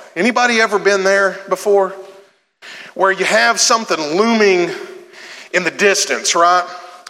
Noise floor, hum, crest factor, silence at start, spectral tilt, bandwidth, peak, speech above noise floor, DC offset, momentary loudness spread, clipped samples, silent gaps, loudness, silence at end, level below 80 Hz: -47 dBFS; none; 14 dB; 0 s; -2 dB/octave; 16 kHz; 0 dBFS; 32 dB; under 0.1%; 19 LU; under 0.1%; none; -14 LUFS; 0.1 s; -80 dBFS